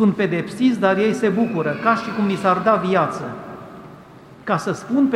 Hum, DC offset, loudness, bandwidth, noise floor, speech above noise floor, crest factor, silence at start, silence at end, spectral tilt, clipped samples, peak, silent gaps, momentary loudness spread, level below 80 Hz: none; under 0.1%; -19 LUFS; 12.5 kHz; -43 dBFS; 24 dB; 18 dB; 0 s; 0 s; -6.5 dB/octave; under 0.1%; -2 dBFS; none; 17 LU; -58 dBFS